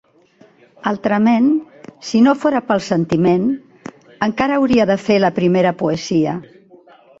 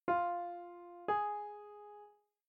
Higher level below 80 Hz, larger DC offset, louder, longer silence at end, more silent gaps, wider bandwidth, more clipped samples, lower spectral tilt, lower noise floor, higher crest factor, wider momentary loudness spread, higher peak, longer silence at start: first, -52 dBFS vs -80 dBFS; neither; first, -16 LUFS vs -39 LUFS; first, 0.8 s vs 0.4 s; neither; first, 7.8 kHz vs 5.6 kHz; neither; about the same, -6.5 dB/octave vs -7.5 dB/octave; second, -50 dBFS vs -62 dBFS; about the same, 14 dB vs 18 dB; second, 12 LU vs 19 LU; first, -2 dBFS vs -22 dBFS; first, 0.85 s vs 0.05 s